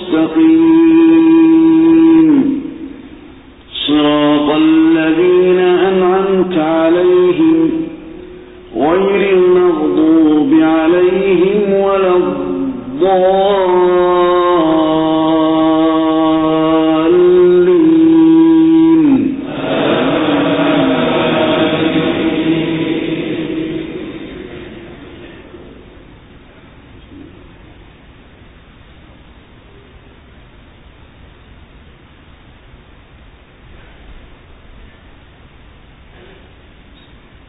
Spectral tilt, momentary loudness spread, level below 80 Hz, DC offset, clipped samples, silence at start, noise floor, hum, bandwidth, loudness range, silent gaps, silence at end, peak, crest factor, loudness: -12 dB/octave; 13 LU; -44 dBFS; under 0.1%; under 0.1%; 0 s; -41 dBFS; none; 4 kHz; 8 LU; none; 3.3 s; -2 dBFS; 10 dB; -11 LUFS